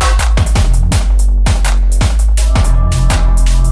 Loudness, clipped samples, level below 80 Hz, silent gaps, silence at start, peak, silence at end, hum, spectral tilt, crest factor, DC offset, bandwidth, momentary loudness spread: -13 LUFS; under 0.1%; -10 dBFS; none; 0 s; 0 dBFS; 0 s; none; -4.5 dB/octave; 8 dB; under 0.1%; 11 kHz; 1 LU